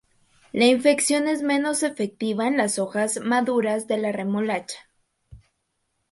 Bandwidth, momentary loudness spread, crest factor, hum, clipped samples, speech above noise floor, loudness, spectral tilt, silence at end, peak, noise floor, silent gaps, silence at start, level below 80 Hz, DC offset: 12 kHz; 8 LU; 18 dB; none; under 0.1%; 52 dB; -23 LUFS; -3.5 dB/octave; 0.75 s; -6 dBFS; -74 dBFS; none; 0.55 s; -64 dBFS; under 0.1%